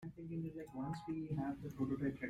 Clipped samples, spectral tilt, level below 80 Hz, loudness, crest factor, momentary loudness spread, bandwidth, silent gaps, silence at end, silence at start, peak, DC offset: under 0.1%; -8.5 dB/octave; -66 dBFS; -44 LUFS; 14 dB; 7 LU; 14 kHz; none; 0 s; 0 s; -28 dBFS; under 0.1%